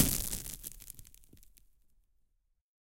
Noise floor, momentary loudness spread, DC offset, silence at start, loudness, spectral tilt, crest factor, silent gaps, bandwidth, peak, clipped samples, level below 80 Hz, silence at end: -75 dBFS; 20 LU; under 0.1%; 0 s; -36 LUFS; -2.5 dB/octave; 34 dB; none; 17 kHz; -6 dBFS; under 0.1%; -48 dBFS; 1.4 s